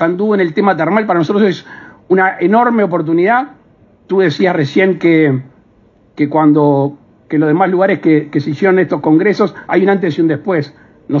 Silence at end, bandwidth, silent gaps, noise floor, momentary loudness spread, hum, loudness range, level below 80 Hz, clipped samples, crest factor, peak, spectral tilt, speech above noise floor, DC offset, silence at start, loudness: 0 s; 7 kHz; none; -49 dBFS; 7 LU; none; 1 LU; -60 dBFS; under 0.1%; 12 dB; 0 dBFS; -8 dB/octave; 37 dB; under 0.1%; 0 s; -13 LUFS